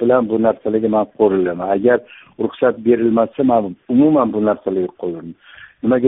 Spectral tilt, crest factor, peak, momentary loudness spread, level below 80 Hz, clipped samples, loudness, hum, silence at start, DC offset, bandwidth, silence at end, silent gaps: -7 dB/octave; 14 dB; -2 dBFS; 10 LU; -56 dBFS; under 0.1%; -17 LUFS; none; 0 s; under 0.1%; 3.9 kHz; 0 s; none